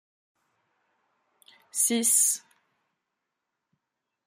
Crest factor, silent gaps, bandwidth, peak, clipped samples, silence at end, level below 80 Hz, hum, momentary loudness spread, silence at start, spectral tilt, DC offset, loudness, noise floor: 22 dB; none; 16 kHz; -10 dBFS; under 0.1%; 1.9 s; -90 dBFS; none; 13 LU; 1.75 s; -0.5 dB/octave; under 0.1%; -23 LUFS; -84 dBFS